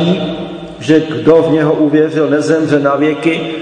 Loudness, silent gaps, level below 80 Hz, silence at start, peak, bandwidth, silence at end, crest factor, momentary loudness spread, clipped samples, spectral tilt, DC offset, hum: -12 LUFS; none; -48 dBFS; 0 s; 0 dBFS; 9.6 kHz; 0 s; 12 dB; 10 LU; 0.3%; -7 dB/octave; under 0.1%; none